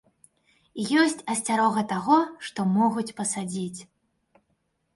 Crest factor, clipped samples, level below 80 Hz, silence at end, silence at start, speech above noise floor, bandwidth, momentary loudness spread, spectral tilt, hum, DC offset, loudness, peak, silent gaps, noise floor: 18 dB; under 0.1%; -70 dBFS; 1.1 s; 0.75 s; 49 dB; 11.5 kHz; 11 LU; -4.5 dB/octave; none; under 0.1%; -25 LUFS; -8 dBFS; none; -73 dBFS